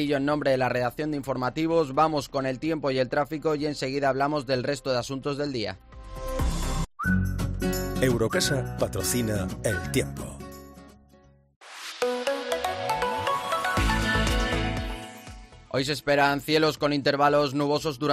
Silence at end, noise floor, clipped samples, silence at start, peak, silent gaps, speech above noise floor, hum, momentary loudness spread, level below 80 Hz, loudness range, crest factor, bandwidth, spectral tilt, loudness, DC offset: 0 s; -57 dBFS; under 0.1%; 0 s; -10 dBFS; 11.56-11.61 s; 31 dB; none; 12 LU; -38 dBFS; 5 LU; 18 dB; 15.5 kHz; -5 dB/octave; -26 LUFS; under 0.1%